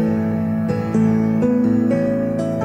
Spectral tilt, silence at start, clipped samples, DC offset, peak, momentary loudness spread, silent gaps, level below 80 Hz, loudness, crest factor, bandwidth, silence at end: -9.5 dB/octave; 0 s; under 0.1%; under 0.1%; -6 dBFS; 4 LU; none; -48 dBFS; -18 LUFS; 12 dB; 8.6 kHz; 0 s